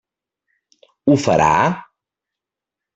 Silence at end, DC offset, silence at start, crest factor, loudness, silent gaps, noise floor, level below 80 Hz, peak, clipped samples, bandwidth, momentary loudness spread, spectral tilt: 1.15 s; under 0.1%; 1.05 s; 20 dB; -16 LUFS; none; -86 dBFS; -50 dBFS; -2 dBFS; under 0.1%; 8.2 kHz; 9 LU; -6 dB/octave